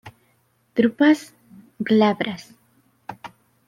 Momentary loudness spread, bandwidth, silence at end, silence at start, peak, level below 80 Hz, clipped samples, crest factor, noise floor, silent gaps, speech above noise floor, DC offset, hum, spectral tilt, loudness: 24 LU; 13.5 kHz; 0.4 s; 0.05 s; -4 dBFS; -68 dBFS; under 0.1%; 18 dB; -64 dBFS; none; 45 dB; under 0.1%; none; -6 dB/octave; -20 LUFS